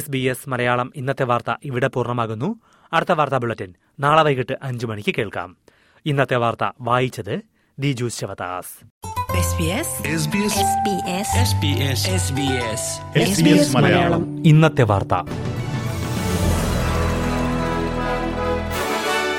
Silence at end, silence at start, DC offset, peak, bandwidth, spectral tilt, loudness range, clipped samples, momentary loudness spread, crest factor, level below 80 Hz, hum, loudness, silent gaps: 0 s; 0 s; under 0.1%; -2 dBFS; 16.5 kHz; -5 dB/octave; 6 LU; under 0.1%; 12 LU; 18 dB; -38 dBFS; none; -20 LUFS; 8.90-9.01 s